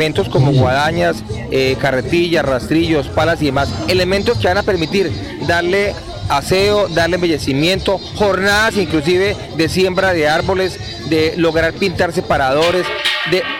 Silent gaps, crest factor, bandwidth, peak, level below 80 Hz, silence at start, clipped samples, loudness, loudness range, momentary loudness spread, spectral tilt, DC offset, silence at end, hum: none; 12 dB; 17 kHz; -2 dBFS; -34 dBFS; 0 s; under 0.1%; -15 LUFS; 1 LU; 5 LU; -5.5 dB/octave; under 0.1%; 0 s; none